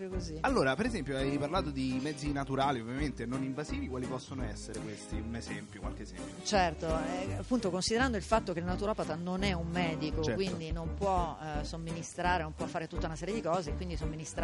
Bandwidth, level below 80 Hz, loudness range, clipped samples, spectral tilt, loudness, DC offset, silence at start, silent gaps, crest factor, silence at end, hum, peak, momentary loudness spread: 11.5 kHz; -44 dBFS; 4 LU; under 0.1%; -5 dB/octave; -34 LUFS; under 0.1%; 0 s; none; 20 dB; 0 s; none; -14 dBFS; 10 LU